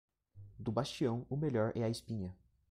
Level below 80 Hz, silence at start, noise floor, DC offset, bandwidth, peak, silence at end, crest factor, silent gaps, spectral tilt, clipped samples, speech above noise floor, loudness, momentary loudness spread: -64 dBFS; 0.35 s; -57 dBFS; under 0.1%; 14.5 kHz; -20 dBFS; 0.35 s; 18 dB; none; -7 dB/octave; under 0.1%; 21 dB; -38 LUFS; 10 LU